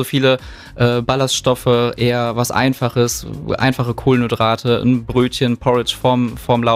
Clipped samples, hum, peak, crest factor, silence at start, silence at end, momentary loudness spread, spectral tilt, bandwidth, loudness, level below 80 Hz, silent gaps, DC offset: under 0.1%; none; -2 dBFS; 14 dB; 0 s; 0 s; 3 LU; -5.5 dB/octave; 16 kHz; -16 LUFS; -40 dBFS; none; under 0.1%